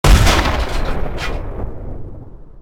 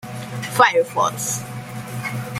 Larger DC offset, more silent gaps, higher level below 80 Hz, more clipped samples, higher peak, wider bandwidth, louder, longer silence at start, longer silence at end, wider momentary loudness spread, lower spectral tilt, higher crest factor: neither; neither; first, -18 dBFS vs -58 dBFS; neither; about the same, 0 dBFS vs -2 dBFS; about the same, 16 kHz vs 16 kHz; about the same, -18 LUFS vs -20 LUFS; about the same, 0.05 s vs 0 s; about the same, 0 s vs 0 s; first, 21 LU vs 16 LU; about the same, -4.5 dB/octave vs -3.5 dB/octave; about the same, 16 dB vs 20 dB